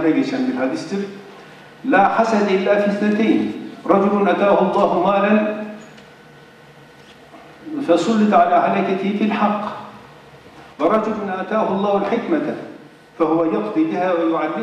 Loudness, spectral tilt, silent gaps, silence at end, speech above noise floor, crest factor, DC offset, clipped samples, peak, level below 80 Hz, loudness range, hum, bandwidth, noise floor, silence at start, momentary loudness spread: -18 LUFS; -7 dB/octave; none; 0 s; 27 dB; 16 dB; under 0.1%; under 0.1%; -2 dBFS; -62 dBFS; 5 LU; none; 9.8 kHz; -44 dBFS; 0 s; 14 LU